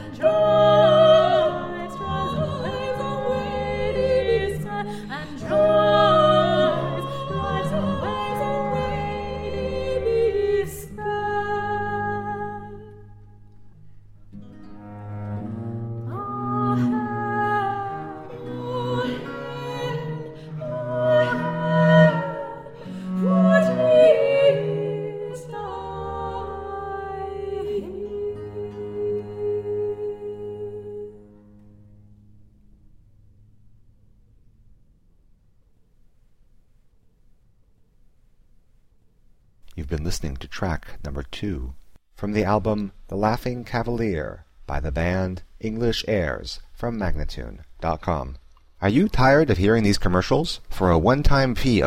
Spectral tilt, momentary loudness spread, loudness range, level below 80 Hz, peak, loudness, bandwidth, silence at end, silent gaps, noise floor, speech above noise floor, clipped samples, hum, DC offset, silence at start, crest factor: -6.5 dB/octave; 17 LU; 13 LU; -38 dBFS; -4 dBFS; -23 LUFS; 15.5 kHz; 0 s; none; -57 dBFS; 36 dB; under 0.1%; none; under 0.1%; 0 s; 20 dB